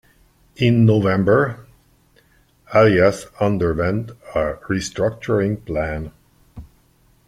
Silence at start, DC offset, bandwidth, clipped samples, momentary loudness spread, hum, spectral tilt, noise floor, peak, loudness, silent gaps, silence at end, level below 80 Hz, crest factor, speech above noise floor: 0.6 s; under 0.1%; 12 kHz; under 0.1%; 12 LU; none; -7 dB/octave; -57 dBFS; -2 dBFS; -19 LUFS; none; 0.65 s; -44 dBFS; 18 dB; 39 dB